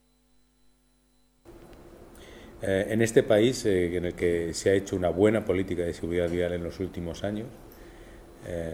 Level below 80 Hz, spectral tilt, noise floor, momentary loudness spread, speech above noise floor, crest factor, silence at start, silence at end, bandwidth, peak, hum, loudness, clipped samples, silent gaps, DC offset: -50 dBFS; -5.5 dB/octave; -65 dBFS; 21 LU; 39 dB; 22 dB; 1.5 s; 0 s; 16 kHz; -6 dBFS; none; -27 LUFS; under 0.1%; none; under 0.1%